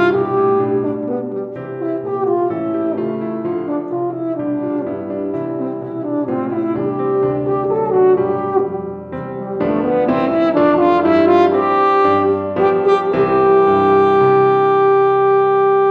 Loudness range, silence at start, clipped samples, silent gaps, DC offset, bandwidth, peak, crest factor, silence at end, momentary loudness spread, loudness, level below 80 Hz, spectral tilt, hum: 8 LU; 0 s; under 0.1%; none; under 0.1%; 5.2 kHz; -2 dBFS; 14 dB; 0 s; 11 LU; -16 LUFS; -54 dBFS; -9 dB/octave; none